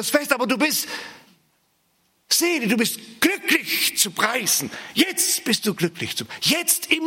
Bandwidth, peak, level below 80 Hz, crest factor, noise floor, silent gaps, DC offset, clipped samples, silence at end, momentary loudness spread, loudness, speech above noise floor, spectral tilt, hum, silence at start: 17 kHz; -2 dBFS; -72 dBFS; 22 dB; -66 dBFS; none; under 0.1%; under 0.1%; 0 s; 7 LU; -20 LUFS; 44 dB; -2 dB/octave; none; 0 s